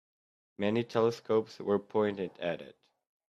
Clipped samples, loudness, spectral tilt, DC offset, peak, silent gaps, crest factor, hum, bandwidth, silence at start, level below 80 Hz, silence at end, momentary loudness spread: under 0.1%; -32 LUFS; -7 dB/octave; under 0.1%; -14 dBFS; none; 20 dB; none; 8 kHz; 0.6 s; -74 dBFS; 0.6 s; 8 LU